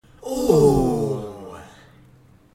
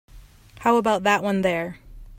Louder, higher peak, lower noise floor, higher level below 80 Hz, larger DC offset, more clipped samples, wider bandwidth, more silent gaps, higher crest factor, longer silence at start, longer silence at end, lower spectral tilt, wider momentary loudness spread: about the same, -20 LUFS vs -22 LUFS; about the same, -2 dBFS vs -4 dBFS; first, -52 dBFS vs -47 dBFS; first, -40 dBFS vs -48 dBFS; neither; neither; about the same, 16.5 kHz vs 16 kHz; neither; about the same, 20 dB vs 18 dB; about the same, 0.25 s vs 0.15 s; first, 0.9 s vs 0 s; first, -7.5 dB/octave vs -5 dB/octave; first, 23 LU vs 8 LU